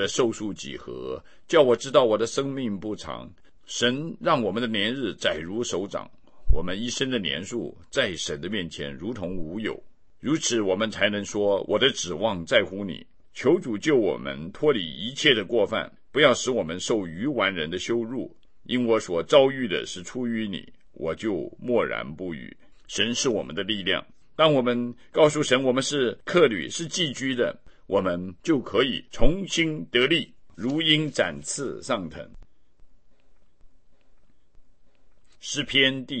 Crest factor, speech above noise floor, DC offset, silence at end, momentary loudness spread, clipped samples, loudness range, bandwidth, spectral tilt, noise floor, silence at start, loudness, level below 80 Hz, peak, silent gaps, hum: 22 dB; 34 dB; 0.4%; 0 s; 13 LU; under 0.1%; 6 LU; 8.8 kHz; -4 dB/octave; -59 dBFS; 0 s; -25 LUFS; -40 dBFS; -4 dBFS; none; none